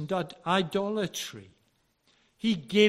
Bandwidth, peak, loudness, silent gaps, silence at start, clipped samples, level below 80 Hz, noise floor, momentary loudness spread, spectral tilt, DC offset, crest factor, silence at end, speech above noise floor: 16 kHz; -8 dBFS; -30 LUFS; none; 0 s; under 0.1%; -68 dBFS; -71 dBFS; 10 LU; -4.5 dB/octave; under 0.1%; 22 dB; 0 s; 43 dB